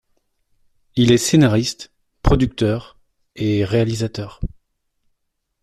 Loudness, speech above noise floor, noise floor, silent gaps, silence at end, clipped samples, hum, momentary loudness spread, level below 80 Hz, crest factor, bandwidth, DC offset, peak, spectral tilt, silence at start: -18 LUFS; 56 dB; -73 dBFS; none; 1.15 s; under 0.1%; none; 17 LU; -32 dBFS; 18 dB; 14 kHz; under 0.1%; -2 dBFS; -5.5 dB/octave; 0.95 s